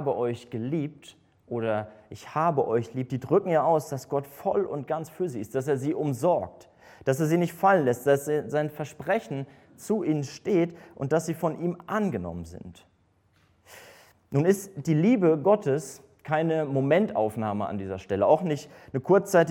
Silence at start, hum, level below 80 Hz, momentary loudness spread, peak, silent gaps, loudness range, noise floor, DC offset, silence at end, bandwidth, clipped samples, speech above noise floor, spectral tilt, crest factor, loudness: 0 s; none; -64 dBFS; 13 LU; -8 dBFS; none; 5 LU; -66 dBFS; under 0.1%; 0 s; 17 kHz; under 0.1%; 40 dB; -7 dB/octave; 18 dB; -27 LUFS